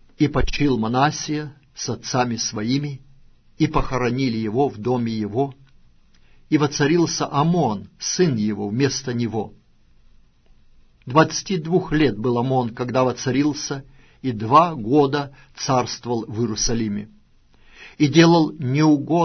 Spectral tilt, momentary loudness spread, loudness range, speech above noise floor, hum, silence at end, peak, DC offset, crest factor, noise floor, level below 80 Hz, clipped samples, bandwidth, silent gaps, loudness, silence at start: -5.5 dB/octave; 11 LU; 4 LU; 33 dB; none; 0 s; -2 dBFS; under 0.1%; 20 dB; -53 dBFS; -40 dBFS; under 0.1%; 6.6 kHz; none; -21 LUFS; 0.2 s